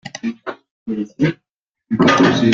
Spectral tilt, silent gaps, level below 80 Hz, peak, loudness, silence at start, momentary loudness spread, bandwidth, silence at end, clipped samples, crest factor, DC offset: -5.5 dB/octave; 0.71-0.86 s, 1.51-1.73 s; -52 dBFS; -2 dBFS; -17 LUFS; 0.05 s; 20 LU; 7.6 kHz; 0 s; under 0.1%; 16 dB; under 0.1%